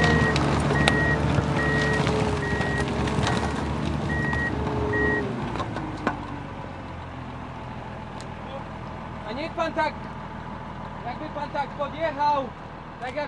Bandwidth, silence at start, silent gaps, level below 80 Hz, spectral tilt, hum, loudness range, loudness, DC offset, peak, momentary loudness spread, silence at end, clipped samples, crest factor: 11.5 kHz; 0 s; none; -40 dBFS; -6 dB/octave; none; 11 LU; -26 LUFS; under 0.1%; -2 dBFS; 14 LU; 0 s; under 0.1%; 24 dB